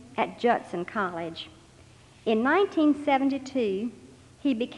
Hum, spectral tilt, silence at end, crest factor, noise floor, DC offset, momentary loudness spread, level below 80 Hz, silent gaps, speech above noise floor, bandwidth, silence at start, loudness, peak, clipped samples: none; -6 dB/octave; 0 s; 18 dB; -53 dBFS; under 0.1%; 13 LU; -66 dBFS; none; 27 dB; 10.5 kHz; 0 s; -27 LUFS; -10 dBFS; under 0.1%